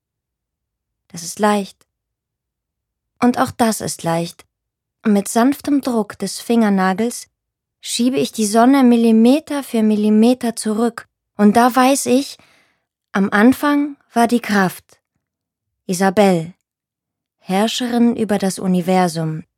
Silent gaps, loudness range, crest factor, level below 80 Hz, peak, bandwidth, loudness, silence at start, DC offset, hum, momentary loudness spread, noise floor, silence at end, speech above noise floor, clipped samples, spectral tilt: none; 6 LU; 16 dB; -62 dBFS; 0 dBFS; 16.5 kHz; -16 LUFS; 1.15 s; under 0.1%; none; 12 LU; -84 dBFS; 0.15 s; 69 dB; under 0.1%; -5 dB/octave